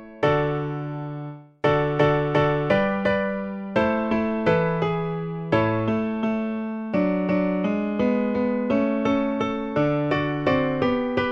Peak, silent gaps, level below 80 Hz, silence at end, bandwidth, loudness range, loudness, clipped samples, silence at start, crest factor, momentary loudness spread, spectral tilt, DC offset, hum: -6 dBFS; none; -50 dBFS; 0 s; 7 kHz; 2 LU; -23 LUFS; under 0.1%; 0 s; 16 dB; 7 LU; -8.5 dB/octave; under 0.1%; none